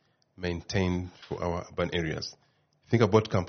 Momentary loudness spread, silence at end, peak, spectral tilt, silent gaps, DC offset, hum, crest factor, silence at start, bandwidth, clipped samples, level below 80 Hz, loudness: 13 LU; 0 s; -6 dBFS; -5.5 dB/octave; none; under 0.1%; none; 22 dB; 0.4 s; 6.6 kHz; under 0.1%; -52 dBFS; -30 LUFS